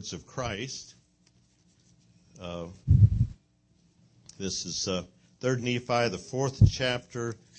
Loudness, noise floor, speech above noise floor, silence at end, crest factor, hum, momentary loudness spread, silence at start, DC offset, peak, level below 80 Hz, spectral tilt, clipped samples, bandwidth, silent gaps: -28 LUFS; -66 dBFS; 37 dB; 0.25 s; 22 dB; none; 16 LU; 0 s; under 0.1%; -6 dBFS; -42 dBFS; -5.5 dB/octave; under 0.1%; 8.6 kHz; none